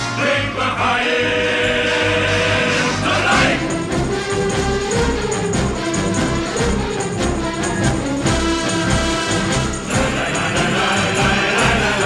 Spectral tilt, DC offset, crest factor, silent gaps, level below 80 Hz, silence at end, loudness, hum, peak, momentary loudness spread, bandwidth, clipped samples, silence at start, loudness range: -4 dB/octave; under 0.1%; 16 dB; none; -30 dBFS; 0 s; -17 LUFS; none; -2 dBFS; 5 LU; 13.5 kHz; under 0.1%; 0 s; 3 LU